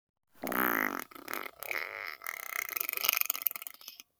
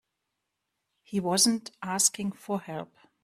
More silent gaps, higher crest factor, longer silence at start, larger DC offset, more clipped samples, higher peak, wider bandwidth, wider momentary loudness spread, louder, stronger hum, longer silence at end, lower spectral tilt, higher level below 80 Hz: neither; first, 32 dB vs 22 dB; second, 0.35 s vs 1.1 s; neither; neither; first, -4 dBFS vs -10 dBFS; first, over 20 kHz vs 15.5 kHz; second, 12 LU vs 16 LU; second, -33 LUFS vs -27 LUFS; neither; second, 0.2 s vs 0.4 s; second, -1 dB/octave vs -2.5 dB/octave; second, -78 dBFS vs -72 dBFS